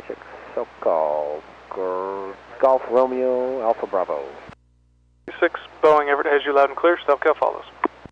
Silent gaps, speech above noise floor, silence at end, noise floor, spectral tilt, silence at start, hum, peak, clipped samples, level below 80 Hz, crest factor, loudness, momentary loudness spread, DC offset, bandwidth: none; 39 dB; 0.25 s; -59 dBFS; -5.5 dB/octave; 0 s; none; -6 dBFS; under 0.1%; -60 dBFS; 16 dB; -21 LUFS; 15 LU; under 0.1%; 7.6 kHz